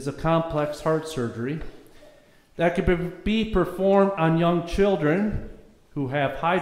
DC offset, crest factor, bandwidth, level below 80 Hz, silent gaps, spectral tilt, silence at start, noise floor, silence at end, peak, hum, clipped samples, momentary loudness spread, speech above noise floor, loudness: under 0.1%; 18 dB; 14.5 kHz; -40 dBFS; none; -7 dB/octave; 0 s; -53 dBFS; 0 s; -6 dBFS; none; under 0.1%; 11 LU; 30 dB; -24 LUFS